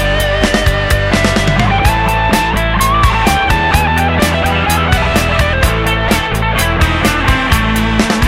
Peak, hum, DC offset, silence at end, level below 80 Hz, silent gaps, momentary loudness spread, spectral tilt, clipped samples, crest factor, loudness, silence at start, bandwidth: 0 dBFS; none; under 0.1%; 0 s; -18 dBFS; none; 2 LU; -4.5 dB/octave; under 0.1%; 12 dB; -12 LUFS; 0 s; 16.5 kHz